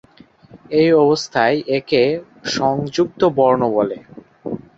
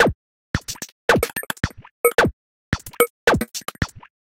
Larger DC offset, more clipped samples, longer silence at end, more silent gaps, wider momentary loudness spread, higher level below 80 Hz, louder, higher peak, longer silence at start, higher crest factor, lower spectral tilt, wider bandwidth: neither; neither; second, 0.2 s vs 0.35 s; second, none vs 0.15-0.54 s, 0.92-1.08 s, 1.91-2.04 s, 2.33-2.72 s, 3.10-3.27 s; about the same, 12 LU vs 11 LU; second, -56 dBFS vs -40 dBFS; first, -17 LUFS vs -22 LUFS; about the same, -2 dBFS vs 0 dBFS; first, 0.55 s vs 0 s; second, 16 dB vs 22 dB; first, -5.5 dB/octave vs -4 dB/octave; second, 7.8 kHz vs 17 kHz